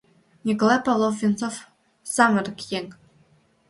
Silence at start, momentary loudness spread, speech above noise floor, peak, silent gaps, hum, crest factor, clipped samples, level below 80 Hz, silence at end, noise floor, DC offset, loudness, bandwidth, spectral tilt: 0.45 s; 15 LU; 38 dB; -4 dBFS; none; none; 20 dB; under 0.1%; -66 dBFS; 0.75 s; -60 dBFS; under 0.1%; -23 LUFS; 11.5 kHz; -4.5 dB/octave